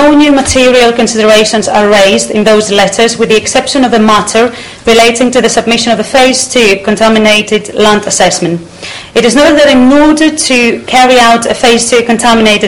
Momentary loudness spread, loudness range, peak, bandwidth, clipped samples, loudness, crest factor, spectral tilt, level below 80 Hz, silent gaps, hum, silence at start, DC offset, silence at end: 5 LU; 2 LU; 0 dBFS; 17 kHz; 3%; -6 LUFS; 6 dB; -3 dB/octave; -34 dBFS; none; none; 0 s; 2%; 0 s